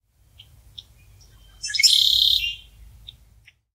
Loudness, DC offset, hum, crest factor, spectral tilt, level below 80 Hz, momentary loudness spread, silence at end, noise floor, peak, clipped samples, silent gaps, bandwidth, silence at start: -16 LUFS; under 0.1%; none; 22 dB; 3 dB/octave; -50 dBFS; 19 LU; 1.2 s; -55 dBFS; -2 dBFS; under 0.1%; none; 16 kHz; 1.65 s